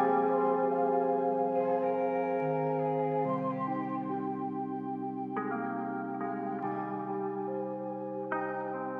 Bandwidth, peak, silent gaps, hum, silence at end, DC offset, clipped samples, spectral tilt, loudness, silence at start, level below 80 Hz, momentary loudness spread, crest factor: 4.4 kHz; -16 dBFS; none; none; 0 s; under 0.1%; under 0.1%; -10 dB/octave; -32 LUFS; 0 s; -84 dBFS; 8 LU; 16 dB